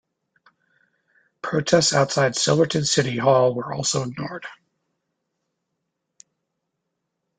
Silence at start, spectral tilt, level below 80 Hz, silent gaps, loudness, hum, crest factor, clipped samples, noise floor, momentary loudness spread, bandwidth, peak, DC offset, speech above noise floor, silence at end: 1.45 s; -4 dB/octave; -60 dBFS; none; -20 LUFS; none; 22 dB; under 0.1%; -79 dBFS; 15 LU; 9.6 kHz; -4 dBFS; under 0.1%; 58 dB; 2.85 s